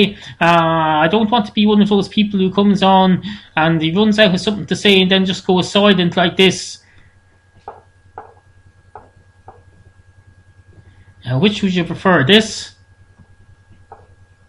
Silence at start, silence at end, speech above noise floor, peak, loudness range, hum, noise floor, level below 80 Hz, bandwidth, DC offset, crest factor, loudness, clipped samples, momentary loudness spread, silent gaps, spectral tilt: 0 s; 0.55 s; 37 dB; 0 dBFS; 8 LU; none; -50 dBFS; -48 dBFS; 11 kHz; under 0.1%; 16 dB; -14 LUFS; under 0.1%; 10 LU; none; -5.5 dB/octave